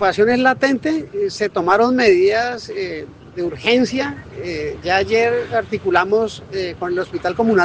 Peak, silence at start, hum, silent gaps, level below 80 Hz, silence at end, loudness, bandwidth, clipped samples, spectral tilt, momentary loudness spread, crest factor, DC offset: 0 dBFS; 0 s; none; none; -50 dBFS; 0 s; -18 LUFS; 9.2 kHz; under 0.1%; -5 dB/octave; 12 LU; 18 dB; under 0.1%